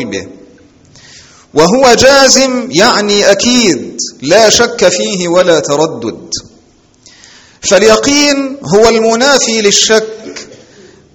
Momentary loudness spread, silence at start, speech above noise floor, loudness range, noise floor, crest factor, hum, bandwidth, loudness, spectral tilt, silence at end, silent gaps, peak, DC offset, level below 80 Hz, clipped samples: 15 LU; 0 s; 37 dB; 5 LU; -45 dBFS; 10 dB; none; over 20 kHz; -8 LUFS; -2.5 dB/octave; 0.6 s; none; 0 dBFS; under 0.1%; -40 dBFS; 1%